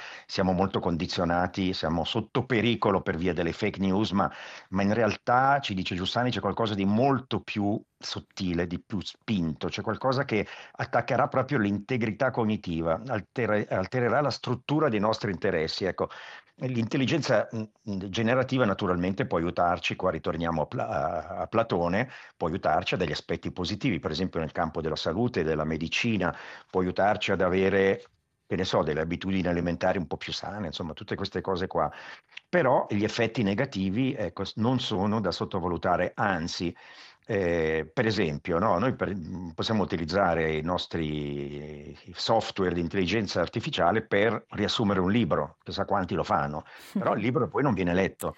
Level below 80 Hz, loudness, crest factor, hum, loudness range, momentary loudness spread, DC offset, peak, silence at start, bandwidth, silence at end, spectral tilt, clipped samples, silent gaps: -56 dBFS; -28 LUFS; 20 dB; none; 3 LU; 9 LU; under 0.1%; -8 dBFS; 0 s; 9.6 kHz; 0.05 s; -6 dB/octave; under 0.1%; none